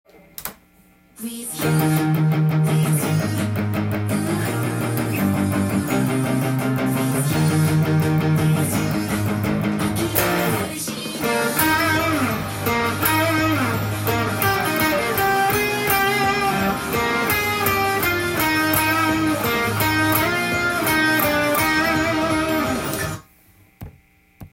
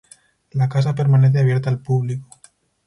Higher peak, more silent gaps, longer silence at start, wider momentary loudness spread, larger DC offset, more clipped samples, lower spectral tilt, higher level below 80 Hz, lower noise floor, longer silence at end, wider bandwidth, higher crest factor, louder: first, -2 dBFS vs -6 dBFS; neither; second, 0.4 s vs 0.55 s; second, 6 LU vs 13 LU; neither; neither; second, -5 dB/octave vs -8.5 dB/octave; first, -46 dBFS vs -56 dBFS; about the same, -54 dBFS vs -54 dBFS; second, 0.05 s vs 0.65 s; first, 17 kHz vs 10.5 kHz; first, 20 dB vs 12 dB; about the same, -20 LUFS vs -18 LUFS